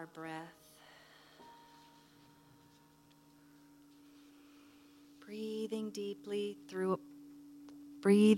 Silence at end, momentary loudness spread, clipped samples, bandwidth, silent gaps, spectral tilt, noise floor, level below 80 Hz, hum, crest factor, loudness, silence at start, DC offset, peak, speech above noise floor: 0 s; 24 LU; under 0.1%; 15 kHz; none; -6.5 dB/octave; -65 dBFS; -84 dBFS; none; 22 dB; -38 LUFS; 0 s; under 0.1%; -16 dBFS; 32 dB